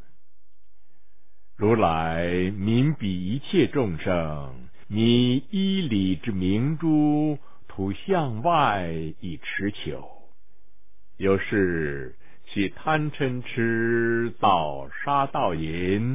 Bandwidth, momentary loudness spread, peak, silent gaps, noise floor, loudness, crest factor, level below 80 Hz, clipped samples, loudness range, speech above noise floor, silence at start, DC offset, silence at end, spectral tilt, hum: 3.8 kHz; 11 LU; -6 dBFS; none; -70 dBFS; -25 LUFS; 18 dB; -48 dBFS; under 0.1%; 5 LU; 46 dB; 1.6 s; 2%; 0 s; -11 dB/octave; none